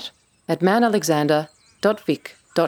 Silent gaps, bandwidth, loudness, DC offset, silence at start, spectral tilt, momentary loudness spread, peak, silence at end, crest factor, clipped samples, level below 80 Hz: none; over 20 kHz; -21 LUFS; under 0.1%; 0 s; -5 dB/octave; 17 LU; -4 dBFS; 0 s; 18 dB; under 0.1%; -70 dBFS